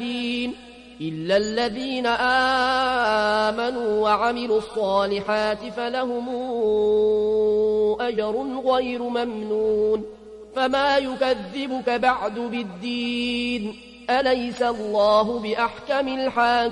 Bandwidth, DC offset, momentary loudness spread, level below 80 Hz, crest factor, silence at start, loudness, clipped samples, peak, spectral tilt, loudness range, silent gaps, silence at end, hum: 11 kHz; under 0.1%; 8 LU; -54 dBFS; 16 dB; 0 s; -23 LUFS; under 0.1%; -8 dBFS; -4.5 dB/octave; 3 LU; none; 0 s; none